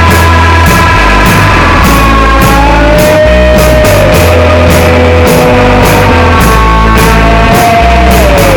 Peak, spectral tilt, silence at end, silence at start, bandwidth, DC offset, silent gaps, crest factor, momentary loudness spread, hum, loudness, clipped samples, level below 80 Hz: 0 dBFS; -5.5 dB/octave; 0 s; 0 s; over 20 kHz; 0.5%; none; 4 dB; 1 LU; none; -4 LUFS; 10%; -10 dBFS